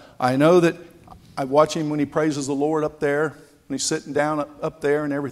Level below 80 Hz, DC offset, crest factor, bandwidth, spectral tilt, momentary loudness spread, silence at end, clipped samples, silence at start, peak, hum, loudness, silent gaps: -58 dBFS; under 0.1%; 18 dB; 14.5 kHz; -5 dB/octave; 12 LU; 0 s; under 0.1%; 0.2 s; -4 dBFS; none; -22 LUFS; none